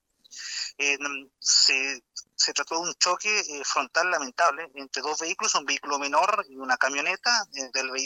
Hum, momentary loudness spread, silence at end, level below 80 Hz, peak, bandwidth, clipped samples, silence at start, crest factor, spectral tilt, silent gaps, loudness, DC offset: none; 11 LU; 0 s; -80 dBFS; -4 dBFS; 17 kHz; under 0.1%; 0.3 s; 22 dB; 1.5 dB/octave; none; -24 LUFS; under 0.1%